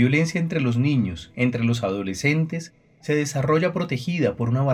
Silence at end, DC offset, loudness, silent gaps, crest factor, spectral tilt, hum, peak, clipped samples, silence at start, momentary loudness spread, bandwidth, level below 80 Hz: 0 s; under 0.1%; -23 LUFS; none; 16 dB; -6.5 dB/octave; none; -6 dBFS; under 0.1%; 0 s; 7 LU; 14.5 kHz; -56 dBFS